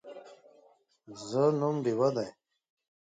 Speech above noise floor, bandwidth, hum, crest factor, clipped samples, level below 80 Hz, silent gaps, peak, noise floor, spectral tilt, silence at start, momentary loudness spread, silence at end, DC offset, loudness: 35 dB; 9.2 kHz; none; 18 dB; under 0.1%; -78 dBFS; none; -16 dBFS; -64 dBFS; -7 dB/octave; 0.05 s; 22 LU; 0.75 s; under 0.1%; -30 LUFS